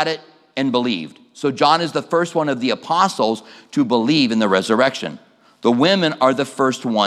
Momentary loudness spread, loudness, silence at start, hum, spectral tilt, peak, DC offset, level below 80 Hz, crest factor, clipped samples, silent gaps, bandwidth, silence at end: 10 LU; -18 LUFS; 0 s; none; -5 dB/octave; 0 dBFS; under 0.1%; -74 dBFS; 18 dB; under 0.1%; none; 13 kHz; 0 s